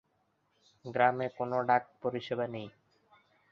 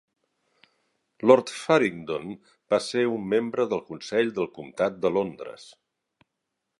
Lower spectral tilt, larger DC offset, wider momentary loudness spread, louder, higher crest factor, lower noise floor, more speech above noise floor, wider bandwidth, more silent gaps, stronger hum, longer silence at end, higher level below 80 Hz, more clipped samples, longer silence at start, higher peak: first, -7.5 dB/octave vs -5.5 dB/octave; neither; about the same, 15 LU vs 16 LU; second, -32 LUFS vs -25 LUFS; about the same, 24 dB vs 24 dB; second, -75 dBFS vs -82 dBFS; second, 44 dB vs 57 dB; second, 6.8 kHz vs 11.5 kHz; neither; neither; second, 0.8 s vs 1.15 s; second, -76 dBFS vs -68 dBFS; neither; second, 0.85 s vs 1.2 s; second, -10 dBFS vs -2 dBFS